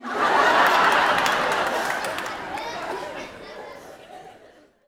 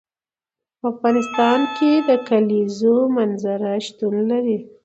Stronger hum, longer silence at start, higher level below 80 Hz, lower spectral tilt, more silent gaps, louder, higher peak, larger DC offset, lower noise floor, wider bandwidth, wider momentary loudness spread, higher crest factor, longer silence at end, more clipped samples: neither; second, 0 s vs 0.85 s; first, -58 dBFS vs -70 dBFS; second, -2 dB/octave vs -6 dB/octave; neither; about the same, -21 LUFS vs -19 LUFS; about the same, -2 dBFS vs -4 dBFS; neither; second, -52 dBFS vs under -90 dBFS; first, over 20 kHz vs 8.2 kHz; first, 22 LU vs 7 LU; first, 22 dB vs 16 dB; first, 0.55 s vs 0.2 s; neither